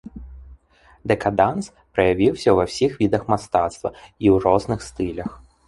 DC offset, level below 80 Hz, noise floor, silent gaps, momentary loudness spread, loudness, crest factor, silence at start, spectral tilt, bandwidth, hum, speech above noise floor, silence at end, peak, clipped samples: under 0.1%; -44 dBFS; -54 dBFS; none; 14 LU; -21 LUFS; 20 dB; 0.15 s; -6.5 dB/octave; 11.5 kHz; none; 34 dB; 0.3 s; -2 dBFS; under 0.1%